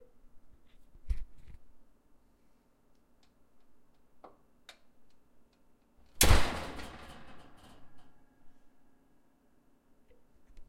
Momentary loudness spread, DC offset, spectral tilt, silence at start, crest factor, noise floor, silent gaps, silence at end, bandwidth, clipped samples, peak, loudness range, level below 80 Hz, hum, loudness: 31 LU; under 0.1%; -3 dB/octave; 0.35 s; 30 dB; -67 dBFS; none; 0.05 s; 16 kHz; under 0.1%; -6 dBFS; 17 LU; -42 dBFS; none; -31 LUFS